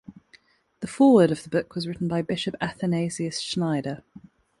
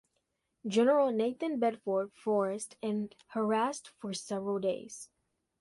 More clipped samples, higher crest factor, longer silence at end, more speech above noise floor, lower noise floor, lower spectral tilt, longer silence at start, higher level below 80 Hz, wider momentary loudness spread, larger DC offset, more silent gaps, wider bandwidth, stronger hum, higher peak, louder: neither; about the same, 20 dB vs 16 dB; about the same, 0.65 s vs 0.55 s; second, 35 dB vs 49 dB; second, -58 dBFS vs -81 dBFS; about the same, -6 dB/octave vs -5 dB/octave; second, 0.1 s vs 0.65 s; first, -60 dBFS vs -80 dBFS; about the same, 16 LU vs 14 LU; neither; neither; about the same, 11.5 kHz vs 11.5 kHz; neither; first, -6 dBFS vs -16 dBFS; first, -24 LUFS vs -32 LUFS